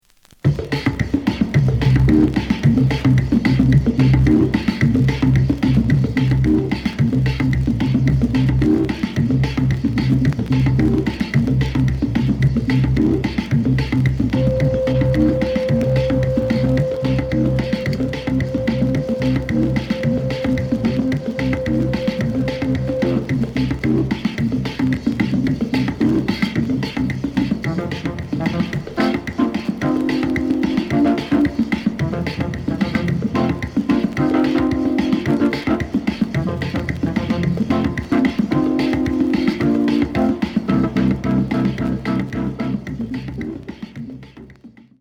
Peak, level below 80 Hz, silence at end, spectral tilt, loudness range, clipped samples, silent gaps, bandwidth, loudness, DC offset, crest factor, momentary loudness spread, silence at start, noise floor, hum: -2 dBFS; -32 dBFS; 0.3 s; -8 dB/octave; 5 LU; under 0.1%; none; 9.2 kHz; -18 LUFS; under 0.1%; 16 dB; 6 LU; 0.45 s; -44 dBFS; none